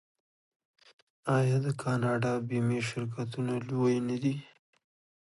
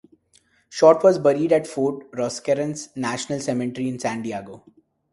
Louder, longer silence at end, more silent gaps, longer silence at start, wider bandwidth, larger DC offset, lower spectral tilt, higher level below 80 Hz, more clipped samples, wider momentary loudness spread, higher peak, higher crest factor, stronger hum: second, -31 LUFS vs -21 LUFS; first, 0.85 s vs 0.55 s; neither; first, 1.25 s vs 0.7 s; about the same, 11.5 kHz vs 11.5 kHz; neither; first, -7 dB/octave vs -5.5 dB/octave; second, -70 dBFS vs -64 dBFS; neither; second, 7 LU vs 13 LU; second, -16 dBFS vs 0 dBFS; second, 16 dB vs 22 dB; neither